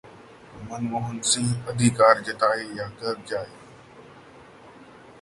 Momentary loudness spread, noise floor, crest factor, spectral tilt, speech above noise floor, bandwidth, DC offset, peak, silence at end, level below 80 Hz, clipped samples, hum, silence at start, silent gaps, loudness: 15 LU; -48 dBFS; 22 dB; -4 dB/octave; 24 dB; 11.5 kHz; under 0.1%; -4 dBFS; 0.1 s; -58 dBFS; under 0.1%; none; 0.05 s; none; -24 LUFS